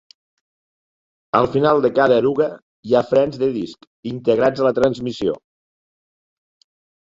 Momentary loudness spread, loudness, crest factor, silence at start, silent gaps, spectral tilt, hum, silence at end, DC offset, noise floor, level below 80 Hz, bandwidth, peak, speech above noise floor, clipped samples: 14 LU; -18 LUFS; 18 dB; 1.35 s; 2.62-2.83 s, 3.87-4.03 s; -7 dB/octave; none; 1.65 s; under 0.1%; under -90 dBFS; -54 dBFS; 7.8 kHz; -2 dBFS; over 72 dB; under 0.1%